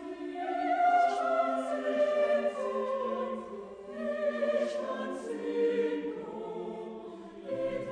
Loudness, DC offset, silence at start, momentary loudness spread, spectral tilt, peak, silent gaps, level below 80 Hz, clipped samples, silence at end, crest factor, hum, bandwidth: -32 LUFS; under 0.1%; 0 s; 14 LU; -5.5 dB/octave; -16 dBFS; none; -70 dBFS; under 0.1%; 0 s; 16 dB; none; 10 kHz